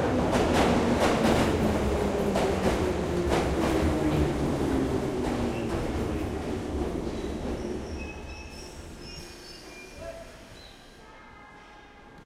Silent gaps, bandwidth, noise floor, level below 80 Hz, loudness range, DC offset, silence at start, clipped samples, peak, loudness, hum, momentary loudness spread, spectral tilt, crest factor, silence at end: none; 16 kHz; -49 dBFS; -38 dBFS; 18 LU; under 0.1%; 0 s; under 0.1%; -10 dBFS; -27 LUFS; none; 22 LU; -6 dB/octave; 18 dB; 0 s